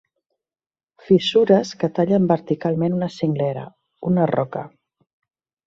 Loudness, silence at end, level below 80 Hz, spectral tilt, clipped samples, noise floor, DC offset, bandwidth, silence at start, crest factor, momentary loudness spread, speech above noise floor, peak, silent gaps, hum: -20 LUFS; 1 s; -60 dBFS; -7.5 dB/octave; under 0.1%; under -90 dBFS; under 0.1%; 7.6 kHz; 1.1 s; 20 dB; 15 LU; over 71 dB; -2 dBFS; none; none